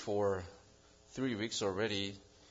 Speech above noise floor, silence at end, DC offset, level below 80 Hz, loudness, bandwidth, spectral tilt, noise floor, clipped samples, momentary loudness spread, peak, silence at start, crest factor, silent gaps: 27 dB; 0.25 s; under 0.1%; -70 dBFS; -37 LUFS; 7.4 kHz; -3.5 dB/octave; -63 dBFS; under 0.1%; 16 LU; -22 dBFS; 0 s; 16 dB; none